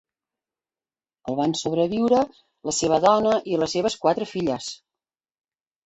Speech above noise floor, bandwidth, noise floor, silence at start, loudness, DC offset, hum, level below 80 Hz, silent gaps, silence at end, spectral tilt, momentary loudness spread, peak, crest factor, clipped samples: over 68 dB; 8.2 kHz; under -90 dBFS; 1.25 s; -23 LUFS; under 0.1%; none; -58 dBFS; none; 1.1 s; -4.5 dB/octave; 13 LU; -4 dBFS; 20 dB; under 0.1%